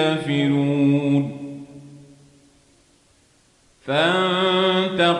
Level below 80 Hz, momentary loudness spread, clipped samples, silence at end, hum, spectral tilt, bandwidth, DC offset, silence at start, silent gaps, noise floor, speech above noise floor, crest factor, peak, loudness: -64 dBFS; 18 LU; under 0.1%; 0 s; none; -6 dB/octave; 10.5 kHz; under 0.1%; 0 s; none; -58 dBFS; 39 dB; 16 dB; -6 dBFS; -19 LUFS